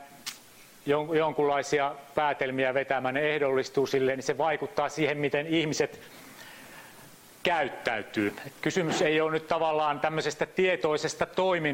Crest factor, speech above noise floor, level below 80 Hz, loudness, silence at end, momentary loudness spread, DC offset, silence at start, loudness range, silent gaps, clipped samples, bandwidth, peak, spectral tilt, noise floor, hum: 18 dB; 25 dB; -64 dBFS; -28 LUFS; 0 s; 14 LU; under 0.1%; 0 s; 4 LU; none; under 0.1%; 16.5 kHz; -10 dBFS; -4.5 dB/octave; -53 dBFS; none